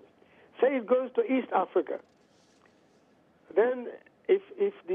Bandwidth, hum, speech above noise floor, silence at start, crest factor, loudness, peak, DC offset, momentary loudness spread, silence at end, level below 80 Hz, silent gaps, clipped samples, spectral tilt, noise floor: 3.8 kHz; none; 35 dB; 0.6 s; 16 dB; -29 LUFS; -14 dBFS; under 0.1%; 11 LU; 0 s; -84 dBFS; none; under 0.1%; -7.5 dB/octave; -63 dBFS